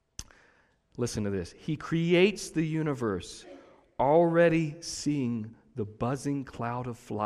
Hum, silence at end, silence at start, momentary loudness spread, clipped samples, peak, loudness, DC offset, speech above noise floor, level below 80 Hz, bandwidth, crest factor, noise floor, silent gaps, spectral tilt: none; 0 s; 0.2 s; 18 LU; under 0.1%; -10 dBFS; -29 LUFS; under 0.1%; 37 dB; -58 dBFS; 13 kHz; 18 dB; -66 dBFS; none; -6 dB/octave